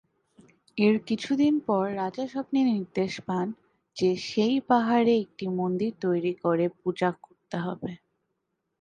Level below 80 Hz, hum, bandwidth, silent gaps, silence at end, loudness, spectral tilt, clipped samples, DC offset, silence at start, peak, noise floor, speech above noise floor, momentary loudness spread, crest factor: -68 dBFS; none; 9.4 kHz; none; 0.85 s; -27 LUFS; -6.5 dB/octave; under 0.1%; under 0.1%; 0.75 s; -8 dBFS; -79 dBFS; 54 dB; 11 LU; 20 dB